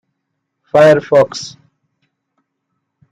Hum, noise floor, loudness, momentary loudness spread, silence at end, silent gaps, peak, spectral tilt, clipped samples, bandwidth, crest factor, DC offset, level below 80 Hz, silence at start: none; -73 dBFS; -11 LUFS; 18 LU; 1.6 s; none; -2 dBFS; -5.5 dB/octave; under 0.1%; 10.5 kHz; 14 dB; under 0.1%; -58 dBFS; 0.75 s